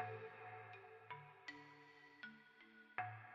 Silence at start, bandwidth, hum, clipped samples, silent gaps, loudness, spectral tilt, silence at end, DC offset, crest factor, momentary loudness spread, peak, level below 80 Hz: 0 s; 7.2 kHz; none; under 0.1%; none; -55 LUFS; -3 dB/octave; 0 s; under 0.1%; 26 dB; 14 LU; -28 dBFS; under -90 dBFS